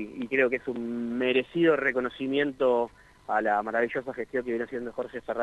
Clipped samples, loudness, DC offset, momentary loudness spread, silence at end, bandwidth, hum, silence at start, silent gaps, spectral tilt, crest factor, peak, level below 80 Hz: under 0.1%; -28 LUFS; under 0.1%; 10 LU; 0 s; 9.4 kHz; none; 0 s; none; -6.5 dB/octave; 18 dB; -10 dBFS; -62 dBFS